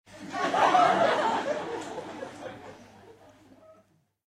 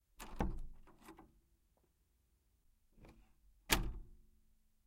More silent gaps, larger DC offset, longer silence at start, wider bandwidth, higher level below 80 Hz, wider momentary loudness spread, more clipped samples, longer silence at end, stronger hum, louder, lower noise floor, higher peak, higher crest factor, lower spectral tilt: neither; neither; about the same, 0.1 s vs 0.2 s; second, 12.5 kHz vs 16 kHz; second, -72 dBFS vs -50 dBFS; second, 21 LU vs 24 LU; neither; first, 1.25 s vs 0.65 s; neither; first, -26 LUFS vs -40 LUFS; second, -64 dBFS vs -77 dBFS; first, -10 dBFS vs -14 dBFS; second, 20 dB vs 32 dB; about the same, -4 dB/octave vs -3 dB/octave